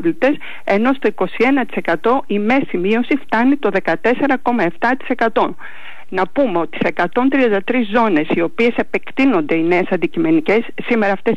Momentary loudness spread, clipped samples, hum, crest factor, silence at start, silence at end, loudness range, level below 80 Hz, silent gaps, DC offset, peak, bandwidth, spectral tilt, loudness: 5 LU; under 0.1%; none; 12 dB; 0 s; 0 s; 2 LU; -50 dBFS; none; 5%; -6 dBFS; 7.8 kHz; -7 dB/octave; -16 LUFS